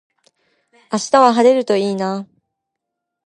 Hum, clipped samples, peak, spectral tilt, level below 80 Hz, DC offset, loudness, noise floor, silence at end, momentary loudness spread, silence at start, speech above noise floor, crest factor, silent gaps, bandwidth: none; under 0.1%; 0 dBFS; -4.5 dB/octave; -66 dBFS; under 0.1%; -15 LUFS; -79 dBFS; 1.05 s; 13 LU; 0.9 s; 64 dB; 18 dB; none; 11 kHz